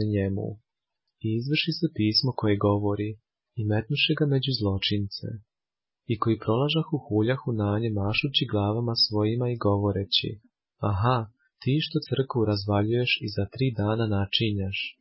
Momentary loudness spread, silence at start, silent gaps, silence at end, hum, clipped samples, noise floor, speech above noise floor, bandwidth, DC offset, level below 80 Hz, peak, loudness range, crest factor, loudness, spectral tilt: 10 LU; 0 s; none; 0.1 s; none; under 0.1%; under -90 dBFS; over 64 dB; 5.8 kHz; under 0.1%; -48 dBFS; -8 dBFS; 2 LU; 18 dB; -26 LUFS; -9.5 dB/octave